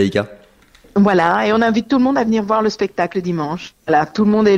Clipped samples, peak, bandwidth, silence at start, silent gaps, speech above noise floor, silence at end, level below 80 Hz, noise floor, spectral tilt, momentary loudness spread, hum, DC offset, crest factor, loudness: under 0.1%; -2 dBFS; 8.4 kHz; 0 s; none; 33 dB; 0 s; -50 dBFS; -49 dBFS; -6.5 dB/octave; 8 LU; none; under 0.1%; 14 dB; -16 LUFS